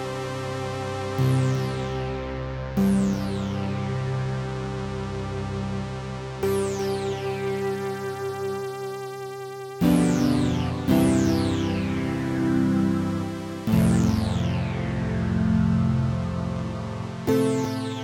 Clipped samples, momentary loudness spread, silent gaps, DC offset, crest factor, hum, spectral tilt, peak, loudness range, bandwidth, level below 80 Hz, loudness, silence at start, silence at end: under 0.1%; 10 LU; none; under 0.1%; 18 dB; none; -7 dB/octave; -6 dBFS; 5 LU; 16 kHz; -42 dBFS; -25 LUFS; 0 s; 0 s